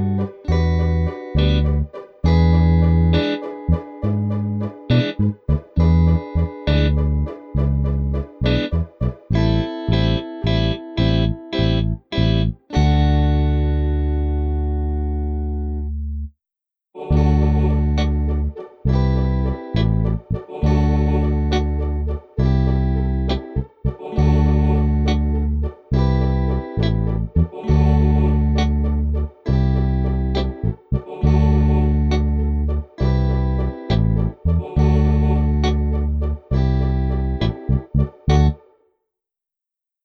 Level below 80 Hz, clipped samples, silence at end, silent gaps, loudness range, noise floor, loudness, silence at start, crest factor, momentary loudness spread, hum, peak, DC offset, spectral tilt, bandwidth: -22 dBFS; under 0.1%; 1.5 s; none; 3 LU; -87 dBFS; -20 LUFS; 0 s; 12 dB; 8 LU; none; -6 dBFS; under 0.1%; -8.5 dB/octave; 6.4 kHz